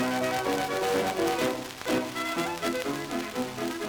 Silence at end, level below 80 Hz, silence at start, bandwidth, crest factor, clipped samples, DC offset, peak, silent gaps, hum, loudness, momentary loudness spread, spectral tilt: 0 s; -60 dBFS; 0 s; over 20 kHz; 18 dB; under 0.1%; under 0.1%; -12 dBFS; none; none; -29 LUFS; 5 LU; -3.5 dB/octave